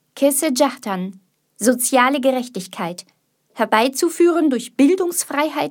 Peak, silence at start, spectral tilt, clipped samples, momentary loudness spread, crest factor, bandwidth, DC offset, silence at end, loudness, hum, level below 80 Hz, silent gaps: 0 dBFS; 0.15 s; -3 dB/octave; under 0.1%; 12 LU; 18 dB; 18 kHz; under 0.1%; 0 s; -18 LUFS; none; -74 dBFS; none